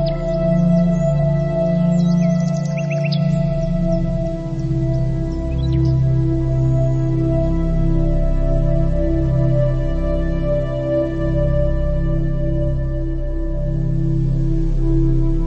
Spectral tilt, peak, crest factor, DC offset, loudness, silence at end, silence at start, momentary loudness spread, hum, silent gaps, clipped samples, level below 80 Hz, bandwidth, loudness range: -9 dB/octave; -4 dBFS; 12 dB; under 0.1%; -19 LUFS; 0 s; 0 s; 5 LU; none; none; under 0.1%; -22 dBFS; 7.4 kHz; 3 LU